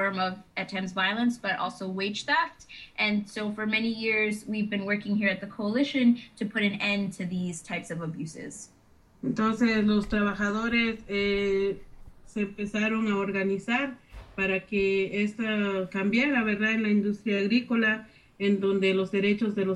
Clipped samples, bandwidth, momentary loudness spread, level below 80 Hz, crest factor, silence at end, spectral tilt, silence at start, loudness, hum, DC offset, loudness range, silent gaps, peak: under 0.1%; 11.5 kHz; 9 LU; -54 dBFS; 16 dB; 0 s; -5.5 dB/octave; 0 s; -27 LUFS; none; under 0.1%; 3 LU; none; -12 dBFS